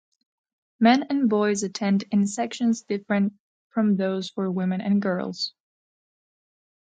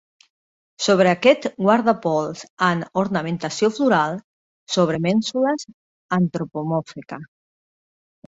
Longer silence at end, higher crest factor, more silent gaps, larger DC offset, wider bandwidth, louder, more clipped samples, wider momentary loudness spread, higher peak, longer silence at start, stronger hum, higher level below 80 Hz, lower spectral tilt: first, 1.35 s vs 1 s; about the same, 22 dB vs 20 dB; second, 3.39-3.70 s vs 2.50-2.57 s, 4.24-4.66 s, 5.74-6.09 s; neither; first, 9.2 kHz vs 8 kHz; second, -24 LUFS vs -20 LUFS; neither; second, 8 LU vs 13 LU; about the same, -4 dBFS vs -2 dBFS; about the same, 0.8 s vs 0.8 s; neither; second, -72 dBFS vs -62 dBFS; about the same, -5.5 dB/octave vs -5.5 dB/octave